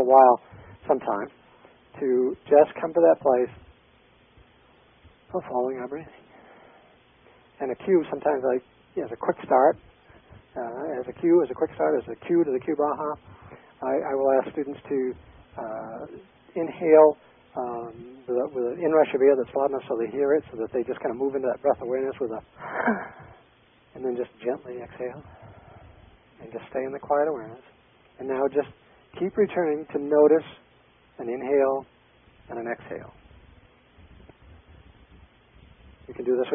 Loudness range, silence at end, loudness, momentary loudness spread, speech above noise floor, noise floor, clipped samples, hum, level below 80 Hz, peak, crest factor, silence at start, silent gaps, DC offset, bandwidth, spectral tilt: 12 LU; 0 s; -25 LUFS; 19 LU; 35 dB; -59 dBFS; under 0.1%; none; -60 dBFS; -4 dBFS; 22 dB; 0 s; none; under 0.1%; 3.7 kHz; -10.5 dB/octave